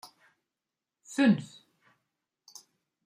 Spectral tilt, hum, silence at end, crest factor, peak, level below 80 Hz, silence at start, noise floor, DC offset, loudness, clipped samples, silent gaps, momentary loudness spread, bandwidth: -6 dB/octave; none; 1.6 s; 22 dB; -12 dBFS; -78 dBFS; 1.1 s; -89 dBFS; under 0.1%; -27 LUFS; under 0.1%; none; 26 LU; 14.5 kHz